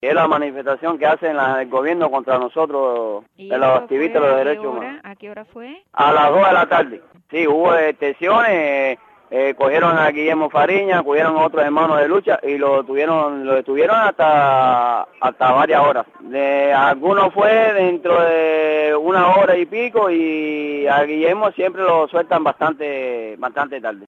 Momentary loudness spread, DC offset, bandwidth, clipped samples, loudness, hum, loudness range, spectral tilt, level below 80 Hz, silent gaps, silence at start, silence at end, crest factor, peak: 10 LU; under 0.1%; 7.4 kHz; under 0.1%; -16 LUFS; none; 4 LU; -7 dB/octave; -68 dBFS; none; 0.05 s; 0.05 s; 12 dB; -4 dBFS